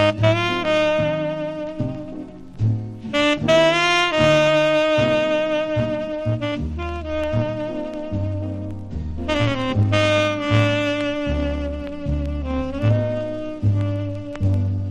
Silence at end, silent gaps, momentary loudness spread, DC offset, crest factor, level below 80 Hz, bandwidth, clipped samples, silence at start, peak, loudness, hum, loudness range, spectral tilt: 0 s; none; 12 LU; under 0.1%; 16 dB; -36 dBFS; 10 kHz; under 0.1%; 0 s; -4 dBFS; -21 LUFS; none; 7 LU; -6 dB/octave